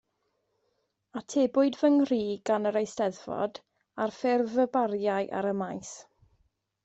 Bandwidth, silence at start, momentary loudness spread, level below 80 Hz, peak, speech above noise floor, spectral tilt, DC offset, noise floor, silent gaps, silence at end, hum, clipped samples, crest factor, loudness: 8.2 kHz; 1.15 s; 16 LU; -72 dBFS; -14 dBFS; 49 dB; -5.5 dB/octave; under 0.1%; -77 dBFS; none; 0.85 s; none; under 0.1%; 16 dB; -28 LUFS